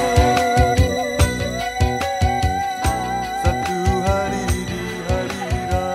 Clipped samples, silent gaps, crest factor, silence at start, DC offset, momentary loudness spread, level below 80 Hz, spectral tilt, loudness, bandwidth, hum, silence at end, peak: under 0.1%; none; 18 dB; 0 s; under 0.1%; 7 LU; -26 dBFS; -5 dB/octave; -20 LUFS; 15 kHz; none; 0 s; -2 dBFS